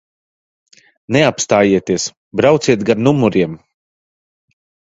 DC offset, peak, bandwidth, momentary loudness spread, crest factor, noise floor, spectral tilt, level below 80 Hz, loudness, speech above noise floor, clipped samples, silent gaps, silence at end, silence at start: under 0.1%; 0 dBFS; 8 kHz; 8 LU; 16 dB; under -90 dBFS; -5 dB/octave; -50 dBFS; -14 LUFS; over 77 dB; under 0.1%; 2.17-2.31 s; 1.3 s; 1.1 s